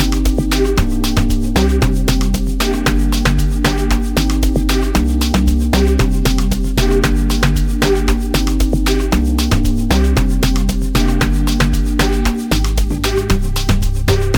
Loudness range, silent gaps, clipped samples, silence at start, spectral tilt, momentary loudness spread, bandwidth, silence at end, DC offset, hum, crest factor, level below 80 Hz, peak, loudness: 1 LU; none; under 0.1%; 0 s; -5.5 dB/octave; 3 LU; 18.5 kHz; 0 s; under 0.1%; none; 12 dB; -16 dBFS; 0 dBFS; -16 LUFS